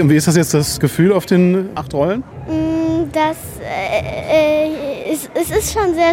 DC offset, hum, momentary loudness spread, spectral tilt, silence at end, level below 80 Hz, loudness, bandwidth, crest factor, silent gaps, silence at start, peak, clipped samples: under 0.1%; none; 9 LU; -5.5 dB/octave; 0 s; -38 dBFS; -16 LUFS; 17 kHz; 14 dB; none; 0 s; 0 dBFS; under 0.1%